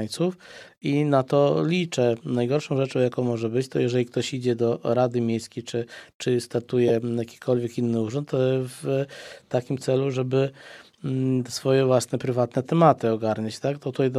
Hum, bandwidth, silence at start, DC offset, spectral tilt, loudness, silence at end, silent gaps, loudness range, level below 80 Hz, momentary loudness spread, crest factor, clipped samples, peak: none; 14 kHz; 0 s; under 0.1%; -6.5 dB/octave; -24 LUFS; 0 s; 6.15-6.20 s; 3 LU; -68 dBFS; 10 LU; 20 dB; under 0.1%; -2 dBFS